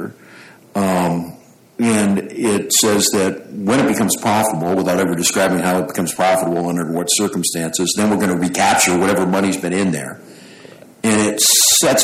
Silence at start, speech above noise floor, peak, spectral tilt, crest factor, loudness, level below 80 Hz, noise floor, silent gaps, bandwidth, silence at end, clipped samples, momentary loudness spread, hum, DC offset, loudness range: 0 s; 26 dB; -2 dBFS; -3 dB/octave; 14 dB; -16 LUFS; -54 dBFS; -42 dBFS; none; 16.5 kHz; 0 s; under 0.1%; 9 LU; none; under 0.1%; 2 LU